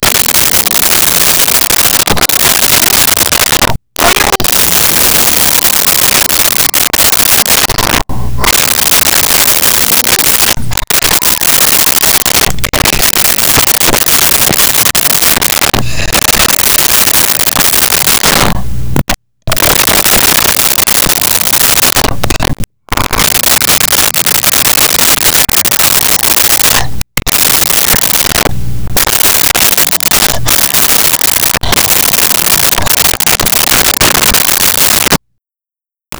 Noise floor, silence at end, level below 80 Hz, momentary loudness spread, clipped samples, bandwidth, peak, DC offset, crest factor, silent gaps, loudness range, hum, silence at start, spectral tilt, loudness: -89 dBFS; 0 s; -26 dBFS; 6 LU; under 0.1%; over 20 kHz; 0 dBFS; under 0.1%; 8 dB; none; 2 LU; none; 0 s; -1 dB/octave; -6 LUFS